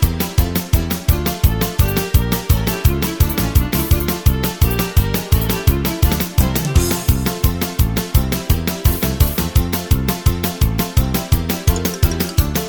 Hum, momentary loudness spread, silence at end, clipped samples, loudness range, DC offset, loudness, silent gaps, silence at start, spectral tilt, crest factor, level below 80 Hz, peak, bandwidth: none; 2 LU; 0 s; under 0.1%; 1 LU; under 0.1%; -17 LUFS; none; 0 s; -5 dB/octave; 16 dB; -20 dBFS; 0 dBFS; over 20 kHz